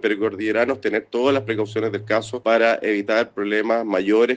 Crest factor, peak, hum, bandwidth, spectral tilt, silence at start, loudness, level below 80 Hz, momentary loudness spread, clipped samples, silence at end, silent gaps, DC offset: 18 dB; -4 dBFS; none; 9.2 kHz; -5.5 dB/octave; 0.05 s; -21 LUFS; -66 dBFS; 5 LU; under 0.1%; 0 s; none; under 0.1%